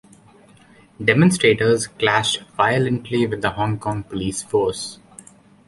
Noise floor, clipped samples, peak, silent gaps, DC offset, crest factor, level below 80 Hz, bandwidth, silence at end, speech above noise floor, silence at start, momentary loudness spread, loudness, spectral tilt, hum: -50 dBFS; under 0.1%; -2 dBFS; none; under 0.1%; 20 dB; -50 dBFS; 11.5 kHz; 0.7 s; 31 dB; 1 s; 10 LU; -19 LUFS; -5 dB/octave; none